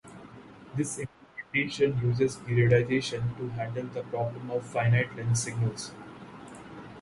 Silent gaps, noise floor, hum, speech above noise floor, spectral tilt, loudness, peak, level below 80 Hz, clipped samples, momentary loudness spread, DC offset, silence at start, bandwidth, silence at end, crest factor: none; -49 dBFS; none; 21 dB; -5.5 dB/octave; -29 LUFS; -10 dBFS; -58 dBFS; under 0.1%; 21 LU; under 0.1%; 0.05 s; 11.5 kHz; 0 s; 18 dB